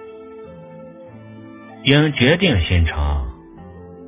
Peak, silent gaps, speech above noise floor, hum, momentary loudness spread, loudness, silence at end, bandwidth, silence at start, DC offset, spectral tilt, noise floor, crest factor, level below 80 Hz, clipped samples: 0 dBFS; none; 23 dB; none; 25 LU; -17 LUFS; 0 s; 4 kHz; 0 s; under 0.1%; -10 dB/octave; -39 dBFS; 20 dB; -28 dBFS; under 0.1%